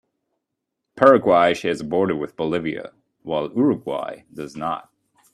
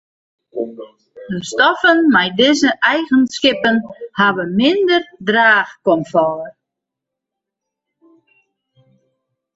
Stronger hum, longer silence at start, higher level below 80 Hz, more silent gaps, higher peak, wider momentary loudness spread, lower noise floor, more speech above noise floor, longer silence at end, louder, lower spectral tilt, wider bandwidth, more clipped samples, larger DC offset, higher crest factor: neither; first, 0.95 s vs 0.55 s; about the same, -60 dBFS vs -58 dBFS; neither; about the same, 0 dBFS vs 0 dBFS; first, 18 LU vs 15 LU; about the same, -80 dBFS vs -82 dBFS; second, 60 dB vs 67 dB; second, 0.55 s vs 3.05 s; second, -20 LUFS vs -14 LUFS; first, -6.5 dB/octave vs -4 dB/octave; first, 12 kHz vs 8 kHz; neither; neither; first, 22 dB vs 16 dB